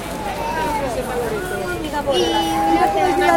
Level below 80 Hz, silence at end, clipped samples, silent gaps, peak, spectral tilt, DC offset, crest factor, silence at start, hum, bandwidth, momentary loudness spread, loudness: -38 dBFS; 0 s; under 0.1%; none; -2 dBFS; -4 dB/octave; under 0.1%; 18 dB; 0 s; none; 16.5 kHz; 8 LU; -20 LUFS